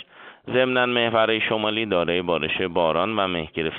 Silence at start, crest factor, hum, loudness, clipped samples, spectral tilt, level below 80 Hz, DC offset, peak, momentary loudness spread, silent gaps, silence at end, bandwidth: 0 s; 18 dB; none; -22 LUFS; under 0.1%; -2 dB/octave; -54 dBFS; under 0.1%; -6 dBFS; 5 LU; none; 0 s; 4.6 kHz